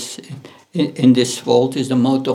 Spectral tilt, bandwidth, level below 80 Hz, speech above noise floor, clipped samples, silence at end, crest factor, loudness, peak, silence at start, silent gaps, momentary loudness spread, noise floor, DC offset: -5.5 dB/octave; 14.5 kHz; -60 dBFS; 21 dB; under 0.1%; 0 s; 16 dB; -16 LUFS; -2 dBFS; 0 s; none; 19 LU; -36 dBFS; under 0.1%